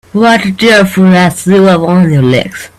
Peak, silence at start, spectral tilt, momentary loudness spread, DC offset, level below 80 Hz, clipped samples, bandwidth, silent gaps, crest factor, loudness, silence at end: 0 dBFS; 0.15 s; -6 dB/octave; 2 LU; under 0.1%; -42 dBFS; 0.2%; 14 kHz; none; 8 dB; -7 LUFS; 0.1 s